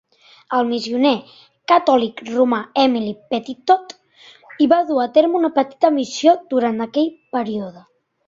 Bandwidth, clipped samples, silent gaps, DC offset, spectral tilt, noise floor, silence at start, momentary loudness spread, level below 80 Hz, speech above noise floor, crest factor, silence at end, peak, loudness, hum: 7.8 kHz; under 0.1%; none; under 0.1%; -5 dB/octave; -48 dBFS; 0.5 s; 9 LU; -64 dBFS; 31 dB; 18 dB; 0.5 s; -2 dBFS; -18 LUFS; none